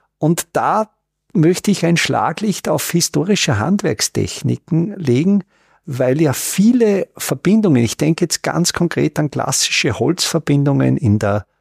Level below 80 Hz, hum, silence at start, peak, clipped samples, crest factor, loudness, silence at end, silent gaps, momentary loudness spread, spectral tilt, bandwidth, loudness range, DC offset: -50 dBFS; none; 0.2 s; -4 dBFS; under 0.1%; 12 dB; -16 LUFS; 0.2 s; none; 6 LU; -5 dB/octave; 15.5 kHz; 2 LU; under 0.1%